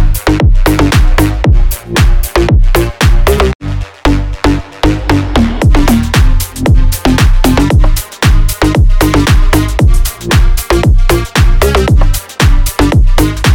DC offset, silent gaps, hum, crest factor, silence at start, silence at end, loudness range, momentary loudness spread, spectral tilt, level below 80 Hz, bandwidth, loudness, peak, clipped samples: under 0.1%; 3.55-3.59 s; none; 8 dB; 0 s; 0 s; 2 LU; 4 LU; -5.5 dB/octave; -10 dBFS; 18 kHz; -10 LUFS; 0 dBFS; under 0.1%